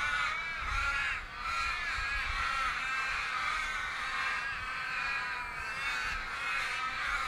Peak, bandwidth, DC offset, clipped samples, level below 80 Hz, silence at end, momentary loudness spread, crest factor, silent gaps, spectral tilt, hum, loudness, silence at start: -20 dBFS; 16 kHz; under 0.1%; under 0.1%; -48 dBFS; 0 s; 4 LU; 14 dB; none; -1.5 dB/octave; none; -33 LUFS; 0 s